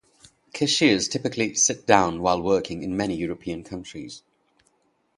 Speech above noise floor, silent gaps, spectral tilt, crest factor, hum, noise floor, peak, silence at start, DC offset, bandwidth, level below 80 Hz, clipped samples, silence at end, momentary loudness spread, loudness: 44 dB; none; -3 dB/octave; 24 dB; none; -67 dBFS; -2 dBFS; 0.55 s; under 0.1%; 11.5 kHz; -54 dBFS; under 0.1%; 1 s; 18 LU; -23 LUFS